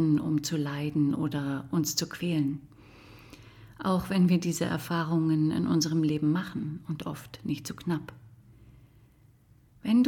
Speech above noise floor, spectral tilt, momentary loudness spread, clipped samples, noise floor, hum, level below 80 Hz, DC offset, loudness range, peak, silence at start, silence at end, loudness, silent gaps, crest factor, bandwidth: 31 dB; -6 dB/octave; 11 LU; under 0.1%; -60 dBFS; none; -60 dBFS; under 0.1%; 7 LU; -14 dBFS; 0 s; 0 s; -29 LUFS; none; 16 dB; 18.5 kHz